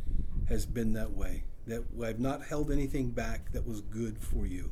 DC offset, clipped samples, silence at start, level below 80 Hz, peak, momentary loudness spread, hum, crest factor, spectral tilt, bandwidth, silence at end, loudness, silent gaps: under 0.1%; under 0.1%; 0 s; -36 dBFS; -16 dBFS; 7 LU; none; 14 dB; -6.5 dB/octave; 14.5 kHz; 0 s; -36 LUFS; none